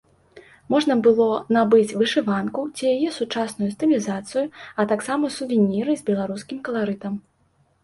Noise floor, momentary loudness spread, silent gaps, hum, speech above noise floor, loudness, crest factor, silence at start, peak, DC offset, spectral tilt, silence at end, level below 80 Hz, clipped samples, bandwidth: -63 dBFS; 10 LU; none; none; 42 dB; -22 LUFS; 18 dB; 0.35 s; -4 dBFS; under 0.1%; -5.5 dB/octave; 0.65 s; -64 dBFS; under 0.1%; 11.5 kHz